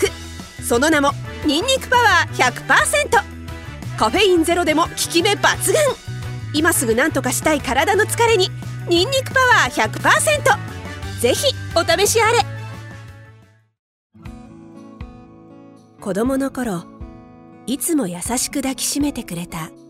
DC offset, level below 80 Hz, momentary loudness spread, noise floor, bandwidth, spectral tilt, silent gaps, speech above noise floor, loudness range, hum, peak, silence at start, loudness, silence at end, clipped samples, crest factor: under 0.1%; -42 dBFS; 18 LU; -48 dBFS; 16 kHz; -3 dB/octave; 13.79-14.10 s; 31 dB; 11 LU; none; -2 dBFS; 0 s; -17 LUFS; 0.15 s; under 0.1%; 18 dB